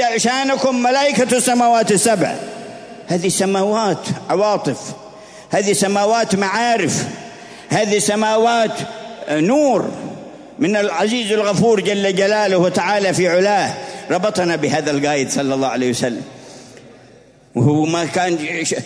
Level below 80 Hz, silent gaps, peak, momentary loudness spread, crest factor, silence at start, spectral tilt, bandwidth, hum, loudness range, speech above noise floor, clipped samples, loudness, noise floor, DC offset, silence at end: -60 dBFS; none; -2 dBFS; 14 LU; 14 dB; 0 s; -4 dB/octave; 11 kHz; none; 4 LU; 30 dB; under 0.1%; -16 LUFS; -46 dBFS; under 0.1%; 0 s